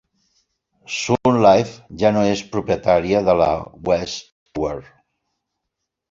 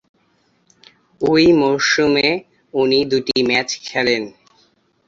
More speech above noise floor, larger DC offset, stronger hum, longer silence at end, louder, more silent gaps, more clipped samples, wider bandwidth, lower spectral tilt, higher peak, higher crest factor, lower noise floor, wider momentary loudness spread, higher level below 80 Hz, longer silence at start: first, 62 dB vs 45 dB; neither; neither; first, 1.3 s vs 0.8 s; second, -19 LUFS vs -16 LUFS; first, 4.32-4.46 s vs none; neither; about the same, 7.8 kHz vs 7.8 kHz; first, -5.5 dB/octave vs -4 dB/octave; about the same, -2 dBFS vs -2 dBFS; about the same, 18 dB vs 18 dB; first, -80 dBFS vs -61 dBFS; first, 15 LU vs 10 LU; first, -46 dBFS vs -54 dBFS; second, 0.9 s vs 1.2 s